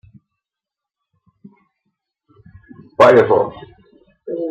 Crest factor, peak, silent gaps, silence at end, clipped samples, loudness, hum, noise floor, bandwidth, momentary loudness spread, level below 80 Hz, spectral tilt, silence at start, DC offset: 18 dB; -2 dBFS; none; 0 s; under 0.1%; -13 LUFS; none; -86 dBFS; 10 kHz; 23 LU; -58 dBFS; -6.5 dB/octave; 3 s; under 0.1%